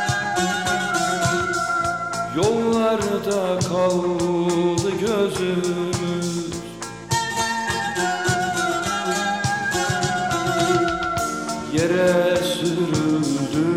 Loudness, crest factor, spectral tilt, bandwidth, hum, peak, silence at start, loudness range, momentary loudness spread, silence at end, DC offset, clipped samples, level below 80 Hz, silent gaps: -21 LUFS; 14 dB; -4.5 dB/octave; 16.5 kHz; none; -6 dBFS; 0 s; 3 LU; 5 LU; 0 s; 0.1%; under 0.1%; -50 dBFS; none